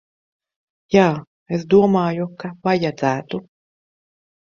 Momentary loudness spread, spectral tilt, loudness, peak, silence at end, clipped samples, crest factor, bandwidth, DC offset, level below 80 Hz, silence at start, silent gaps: 14 LU; -7 dB/octave; -19 LUFS; -2 dBFS; 1.2 s; under 0.1%; 20 dB; 7.2 kHz; under 0.1%; -58 dBFS; 0.9 s; 1.27-1.46 s